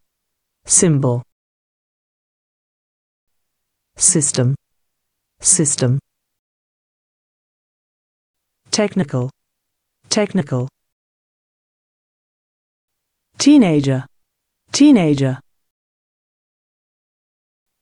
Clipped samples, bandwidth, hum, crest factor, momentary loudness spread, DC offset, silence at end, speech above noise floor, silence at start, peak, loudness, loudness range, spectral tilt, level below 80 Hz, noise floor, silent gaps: under 0.1%; 10.5 kHz; none; 20 dB; 13 LU; under 0.1%; 2.4 s; 62 dB; 0.65 s; 0 dBFS; -15 LUFS; 9 LU; -4.5 dB/octave; -58 dBFS; -76 dBFS; 1.32-3.27 s, 6.39-8.34 s, 10.92-12.88 s